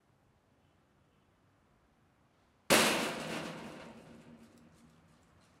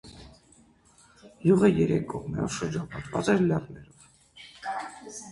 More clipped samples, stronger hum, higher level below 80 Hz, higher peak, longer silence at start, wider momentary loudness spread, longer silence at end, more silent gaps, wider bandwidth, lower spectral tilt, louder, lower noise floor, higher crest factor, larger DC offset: neither; neither; second, -70 dBFS vs -54 dBFS; second, -12 dBFS vs -8 dBFS; first, 2.7 s vs 0.05 s; about the same, 24 LU vs 25 LU; first, 1.15 s vs 0 s; neither; first, 16 kHz vs 11.5 kHz; second, -2 dB/octave vs -6.5 dB/octave; second, -31 LUFS vs -27 LUFS; first, -70 dBFS vs -59 dBFS; first, 26 dB vs 20 dB; neither